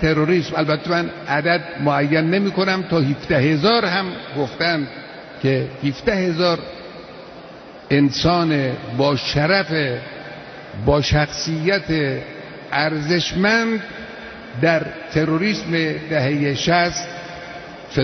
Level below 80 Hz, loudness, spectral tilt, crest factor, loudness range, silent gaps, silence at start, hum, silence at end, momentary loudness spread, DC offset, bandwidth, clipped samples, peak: -42 dBFS; -19 LUFS; -5.5 dB/octave; 18 dB; 3 LU; none; 0 s; none; 0 s; 17 LU; under 0.1%; 6.4 kHz; under 0.1%; -2 dBFS